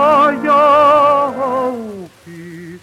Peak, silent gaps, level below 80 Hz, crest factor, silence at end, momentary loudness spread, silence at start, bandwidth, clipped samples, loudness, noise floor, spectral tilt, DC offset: -2 dBFS; none; -58 dBFS; 10 dB; 0.05 s; 23 LU; 0 s; 13 kHz; under 0.1%; -12 LUFS; -34 dBFS; -5.5 dB/octave; under 0.1%